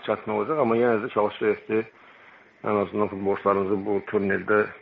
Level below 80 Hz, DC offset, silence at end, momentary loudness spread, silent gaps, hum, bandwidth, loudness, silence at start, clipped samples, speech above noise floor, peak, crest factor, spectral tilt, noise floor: -66 dBFS; under 0.1%; 0.05 s; 5 LU; none; none; 4.8 kHz; -25 LUFS; 0 s; under 0.1%; 28 dB; -8 dBFS; 18 dB; -5 dB/octave; -52 dBFS